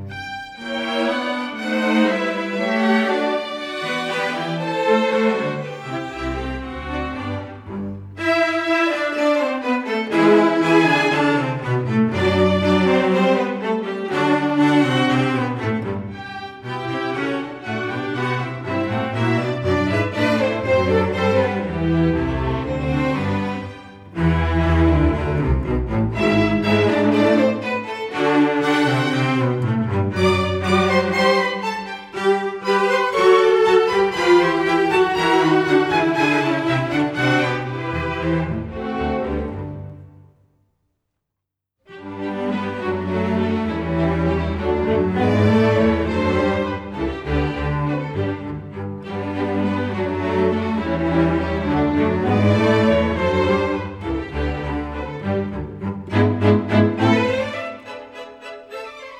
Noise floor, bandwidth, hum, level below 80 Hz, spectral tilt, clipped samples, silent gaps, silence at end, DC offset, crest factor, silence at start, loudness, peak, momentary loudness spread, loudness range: -82 dBFS; 13.5 kHz; none; -36 dBFS; -6.5 dB/octave; under 0.1%; none; 0 s; under 0.1%; 16 dB; 0 s; -19 LUFS; -4 dBFS; 12 LU; 7 LU